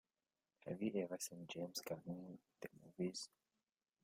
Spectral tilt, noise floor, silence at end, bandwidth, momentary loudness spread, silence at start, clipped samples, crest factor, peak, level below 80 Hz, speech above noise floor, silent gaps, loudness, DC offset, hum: -4.5 dB/octave; under -90 dBFS; 0.75 s; 16 kHz; 14 LU; 0.65 s; under 0.1%; 20 dB; -30 dBFS; -86 dBFS; over 43 dB; none; -48 LUFS; under 0.1%; none